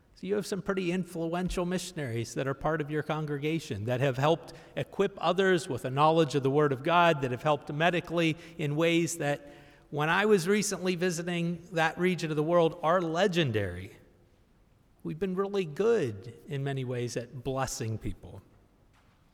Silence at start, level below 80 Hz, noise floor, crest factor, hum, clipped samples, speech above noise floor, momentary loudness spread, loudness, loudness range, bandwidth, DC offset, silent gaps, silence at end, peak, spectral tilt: 0.2 s; -56 dBFS; -63 dBFS; 18 dB; none; under 0.1%; 34 dB; 11 LU; -29 LUFS; 6 LU; 16.5 kHz; under 0.1%; none; 0.95 s; -10 dBFS; -5.5 dB/octave